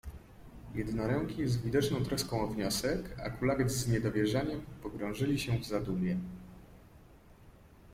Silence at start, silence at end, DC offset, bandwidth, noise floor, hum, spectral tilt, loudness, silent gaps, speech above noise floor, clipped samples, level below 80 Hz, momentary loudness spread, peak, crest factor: 0.05 s; 0 s; under 0.1%; 16.5 kHz; -57 dBFS; none; -5.5 dB/octave; -34 LUFS; none; 24 dB; under 0.1%; -52 dBFS; 13 LU; -16 dBFS; 18 dB